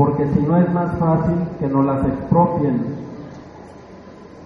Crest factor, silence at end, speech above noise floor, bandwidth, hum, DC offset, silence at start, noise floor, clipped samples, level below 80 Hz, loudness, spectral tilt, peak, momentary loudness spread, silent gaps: 16 dB; 0 s; 22 dB; 5.2 kHz; none; under 0.1%; 0 s; -39 dBFS; under 0.1%; -42 dBFS; -18 LUFS; -11 dB/octave; -2 dBFS; 21 LU; none